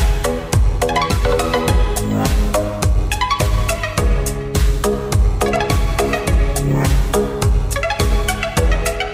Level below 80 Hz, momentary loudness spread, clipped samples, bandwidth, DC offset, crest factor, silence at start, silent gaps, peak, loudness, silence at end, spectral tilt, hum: -18 dBFS; 2 LU; under 0.1%; 16 kHz; under 0.1%; 14 dB; 0 s; none; -2 dBFS; -18 LUFS; 0 s; -5 dB/octave; none